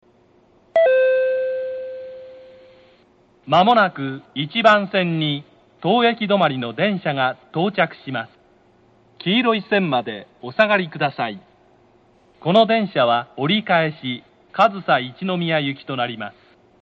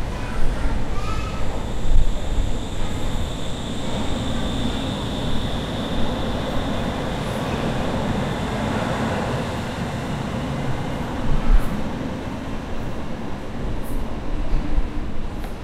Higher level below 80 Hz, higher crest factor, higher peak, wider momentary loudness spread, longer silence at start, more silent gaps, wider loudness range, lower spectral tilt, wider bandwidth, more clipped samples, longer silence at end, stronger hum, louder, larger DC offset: second, -66 dBFS vs -24 dBFS; about the same, 20 dB vs 18 dB; about the same, -2 dBFS vs -2 dBFS; first, 14 LU vs 7 LU; first, 0.75 s vs 0 s; neither; about the same, 3 LU vs 4 LU; about the same, -7 dB/octave vs -6 dB/octave; second, 7.6 kHz vs 12 kHz; neither; first, 0.5 s vs 0 s; neither; first, -19 LUFS vs -26 LUFS; neither